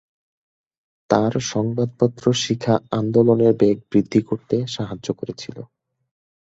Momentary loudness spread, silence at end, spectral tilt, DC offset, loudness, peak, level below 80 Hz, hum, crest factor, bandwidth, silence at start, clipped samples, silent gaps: 12 LU; 0.85 s; -6 dB/octave; under 0.1%; -20 LUFS; -2 dBFS; -56 dBFS; none; 20 dB; 8 kHz; 1.1 s; under 0.1%; none